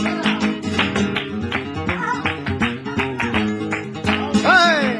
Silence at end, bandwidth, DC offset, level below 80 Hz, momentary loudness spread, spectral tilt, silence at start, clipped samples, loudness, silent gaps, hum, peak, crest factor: 0 s; 11 kHz; under 0.1%; -46 dBFS; 11 LU; -5 dB/octave; 0 s; under 0.1%; -19 LUFS; none; none; -2 dBFS; 18 dB